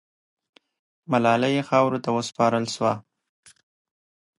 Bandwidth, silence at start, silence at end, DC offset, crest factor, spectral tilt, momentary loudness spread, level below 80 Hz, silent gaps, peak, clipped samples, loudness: 11.5 kHz; 1.1 s; 1.4 s; under 0.1%; 22 dB; -5.5 dB/octave; 6 LU; -70 dBFS; none; -4 dBFS; under 0.1%; -23 LUFS